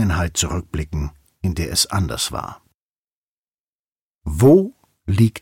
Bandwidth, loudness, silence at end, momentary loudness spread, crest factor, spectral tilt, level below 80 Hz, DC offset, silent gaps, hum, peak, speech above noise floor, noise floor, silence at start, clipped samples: 16.5 kHz; -19 LUFS; 0.05 s; 18 LU; 18 dB; -5 dB/octave; -34 dBFS; under 0.1%; 2.74-4.19 s; none; -4 dBFS; over 72 dB; under -90 dBFS; 0 s; under 0.1%